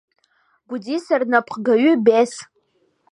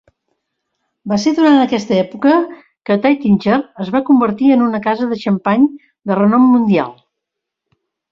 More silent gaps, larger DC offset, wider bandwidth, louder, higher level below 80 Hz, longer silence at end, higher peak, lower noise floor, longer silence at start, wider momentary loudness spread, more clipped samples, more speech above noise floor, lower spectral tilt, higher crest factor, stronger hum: neither; neither; first, 11 kHz vs 7.4 kHz; second, -18 LUFS vs -14 LUFS; second, -76 dBFS vs -56 dBFS; second, 0.7 s vs 1.2 s; about the same, -2 dBFS vs -2 dBFS; second, -64 dBFS vs -79 dBFS; second, 0.7 s vs 1.05 s; first, 17 LU vs 9 LU; neither; second, 47 dB vs 66 dB; second, -5 dB/octave vs -7 dB/octave; about the same, 18 dB vs 14 dB; neither